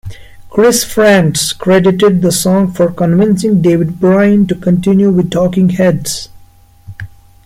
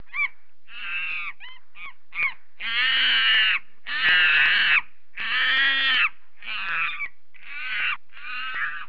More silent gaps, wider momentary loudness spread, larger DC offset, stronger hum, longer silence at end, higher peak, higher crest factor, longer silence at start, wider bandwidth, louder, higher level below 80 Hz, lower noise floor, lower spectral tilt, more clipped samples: neither; second, 11 LU vs 18 LU; second, under 0.1% vs 2%; neither; first, 0.4 s vs 0.05 s; first, 0 dBFS vs -10 dBFS; about the same, 10 dB vs 14 dB; about the same, 0.05 s vs 0.15 s; first, 16 kHz vs 5.4 kHz; first, -10 LUFS vs -21 LUFS; first, -40 dBFS vs -64 dBFS; second, -41 dBFS vs -49 dBFS; first, -5.5 dB/octave vs -1.5 dB/octave; neither